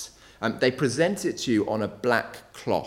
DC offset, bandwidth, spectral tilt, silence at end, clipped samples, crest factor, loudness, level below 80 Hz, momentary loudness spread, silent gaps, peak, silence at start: under 0.1%; 16.5 kHz; -5 dB/octave; 0 s; under 0.1%; 20 dB; -26 LUFS; -60 dBFS; 11 LU; none; -6 dBFS; 0 s